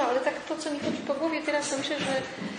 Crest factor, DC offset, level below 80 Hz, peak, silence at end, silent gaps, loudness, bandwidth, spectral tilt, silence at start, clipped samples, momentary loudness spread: 16 dB; under 0.1%; -70 dBFS; -14 dBFS; 0 s; none; -29 LUFS; 10.5 kHz; -3.5 dB/octave; 0 s; under 0.1%; 4 LU